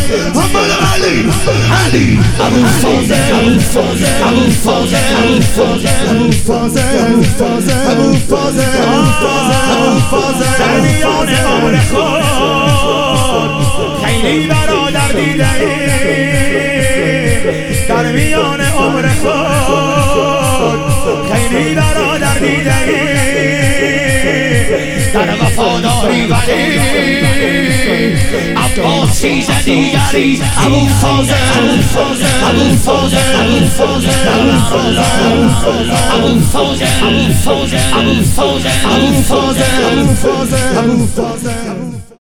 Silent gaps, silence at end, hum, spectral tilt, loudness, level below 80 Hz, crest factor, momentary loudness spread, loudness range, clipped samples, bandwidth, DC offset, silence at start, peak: none; 0 s; none; -4.5 dB/octave; -11 LUFS; -24 dBFS; 10 dB; 3 LU; 2 LU; under 0.1%; 17.5 kHz; 2%; 0 s; 0 dBFS